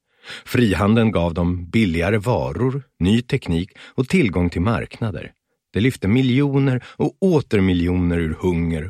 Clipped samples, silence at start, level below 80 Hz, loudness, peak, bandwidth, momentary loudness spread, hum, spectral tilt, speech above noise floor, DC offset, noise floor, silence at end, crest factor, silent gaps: under 0.1%; 0.25 s; -38 dBFS; -20 LUFS; -4 dBFS; 15.5 kHz; 10 LU; none; -7.5 dB/octave; 20 dB; under 0.1%; -39 dBFS; 0 s; 16 dB; none